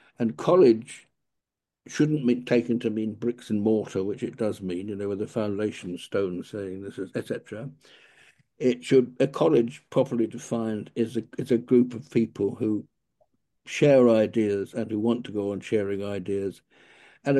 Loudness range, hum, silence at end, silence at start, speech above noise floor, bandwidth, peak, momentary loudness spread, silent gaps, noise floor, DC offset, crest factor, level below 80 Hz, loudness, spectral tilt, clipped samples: 7 LU; none; 0 s; 0.2 s; 60 dB; 12 kHz; -8 dBFS; 14 LU; none; -85 dBFS; under 0.1%; 18 dB; -70 dBFS; -26 LUFS; -7 dB/octave; under 0.1%